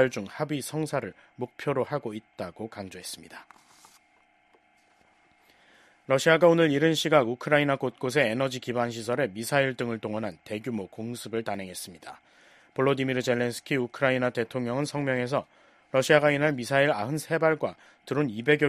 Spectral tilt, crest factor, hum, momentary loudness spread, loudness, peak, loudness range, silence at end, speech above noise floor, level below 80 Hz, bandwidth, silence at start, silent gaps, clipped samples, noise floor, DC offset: -5 dB/octave; 22 dB; none; 16 LU; -27 LUFS; -6 dBFS; 12 LU; 0 s; 37 dB; -68 dBFS; 14 kHz; 0 s; none; under 0.1%; -64 dBFS; under 0.1%